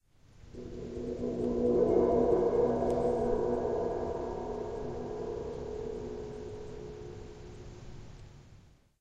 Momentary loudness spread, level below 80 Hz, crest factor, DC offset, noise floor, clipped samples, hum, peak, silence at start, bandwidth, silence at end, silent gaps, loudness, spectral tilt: 22 LU; -48 dBFS; 18 dB; under 0.1%; -58 dBFS; under 0.1%; none; -14 dBFS; 0.35 s; 8.6 kHz; 0.4 s; none; -32 LUFS; -8 dB/octave